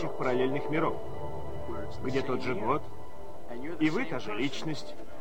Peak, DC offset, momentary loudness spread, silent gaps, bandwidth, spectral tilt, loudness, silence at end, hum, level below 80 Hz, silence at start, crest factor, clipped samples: -14 dBFS; 3%; 15 LU; none; 16 kHz; -6 dB/octave; -33 LUFS; 0 s; none; -54 dBFS; 0 s; 18 dB; under 0.1%